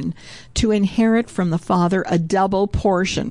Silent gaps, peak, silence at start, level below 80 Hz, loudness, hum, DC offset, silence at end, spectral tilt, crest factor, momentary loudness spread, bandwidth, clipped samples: none; -8 dBFS; 0 s; -36 dBFS; -19 LUFS; none; 0.4%; 0 s; -6 dB/octave; 12 dB; 5 LU; 11 kHz; under 0.1%